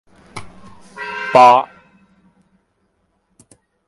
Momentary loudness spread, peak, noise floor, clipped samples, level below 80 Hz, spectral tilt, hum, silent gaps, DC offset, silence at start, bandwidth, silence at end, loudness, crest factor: 27 LU; 0 dBFS; -65 dBFS; under 0.1%; -58 dBFS; -4.5 dB/octave; none; none; under 0.1%; 0.35 s; 11.5 kHz; 2.25 s; -12 LUFS; 18 dB